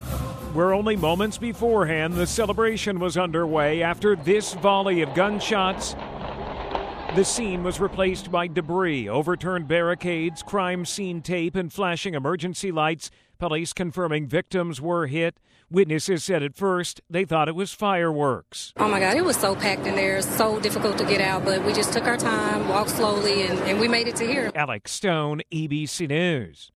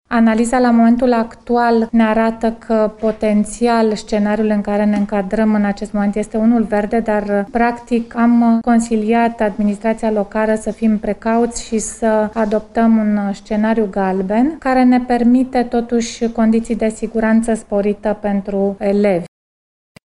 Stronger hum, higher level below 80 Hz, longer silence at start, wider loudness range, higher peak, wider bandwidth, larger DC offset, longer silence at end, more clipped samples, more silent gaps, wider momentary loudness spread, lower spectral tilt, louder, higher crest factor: neither; second, -46 dBFS vs -40 dBFS; about the same, 0 s vs 0.1 s; about the same, 4 LU vs 2 LU; second, -6 dBFS vs -2 dBFS; first, 14.5 kHz vs 11.5 kHz; neither; second, 0.1 s vs 0.75 s; neither; neither; about the same, 7 LU vs 6 LU; second, -4.5 dB/octave vs -6 dB/octave; second, -24 LUFS vs -16 LUFS; about the same, 18 dB vs 14 dB